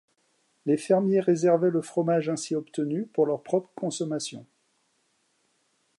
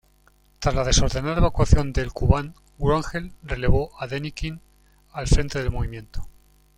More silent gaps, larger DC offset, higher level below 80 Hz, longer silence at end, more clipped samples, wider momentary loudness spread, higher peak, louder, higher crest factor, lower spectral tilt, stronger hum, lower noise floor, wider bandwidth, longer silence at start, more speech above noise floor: neither; neither; second, -80 dBFS vs -28 dBFS; first, 1.55 s vs 0.5 s; neither; second, 11 LU vs 15 LU; second, -10 dBFS vs -2 dBFS; about the same, -26 LUFS vs -24 LUFS; about the same, 18 dB vs 20 dB; about the same, -6 dB/octave vs -5 dB/octave; neither; first, -71 dBFS vs -58 dBFS; about the same, 11.5 kHz vs 11.5 kHz; about the same, 0.65 s vs 0.6 s; first, 46 dB vs 37 dB